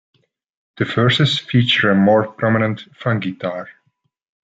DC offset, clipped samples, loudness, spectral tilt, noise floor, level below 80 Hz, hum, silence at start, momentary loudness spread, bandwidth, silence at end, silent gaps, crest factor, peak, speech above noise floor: under 0.1%; under 0.1%; -17 LUFS; -6.5 dB/octave; -68 dBFS; -60 dBFS; none; 0.75 s; 11 LU; 7.8 kHz; 0.75 s; none; 16 dB; -4 dBFS; 51 dB